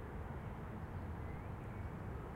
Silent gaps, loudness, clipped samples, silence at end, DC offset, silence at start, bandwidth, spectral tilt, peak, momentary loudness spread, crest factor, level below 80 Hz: none; -48 LUFS; under 0.1%; 0 s; under 0.1%; 0 s; 16 kHz; -8.5 dB/octave; -34 dBFS; 1 LU; 12 dB; -52 dBFS